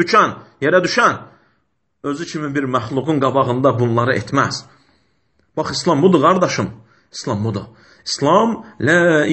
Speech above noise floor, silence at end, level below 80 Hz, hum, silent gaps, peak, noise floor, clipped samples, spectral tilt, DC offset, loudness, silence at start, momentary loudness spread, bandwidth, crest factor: 52 dB; 0 s; -54 dBFS; none; none; 0 dBFS; -68 dBFS; under 0.1%; -5.5 dB/octave; under 0.1%; -17 LUFS; 0 s; 14 LU; 8.6 kHz; 16 dB